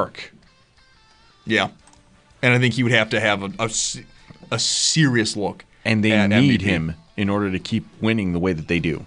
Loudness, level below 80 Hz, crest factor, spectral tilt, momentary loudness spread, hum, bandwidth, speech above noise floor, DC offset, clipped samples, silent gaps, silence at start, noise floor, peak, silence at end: -20 LUFS; -48 dBFS; 18 dB; -4 dB/octave; 12 LU; none; 10.5 kHz; 35 dB; under 0.1%; under 0.1%; none; 0 s; -55 dBFS; -2 dBFS; 0 s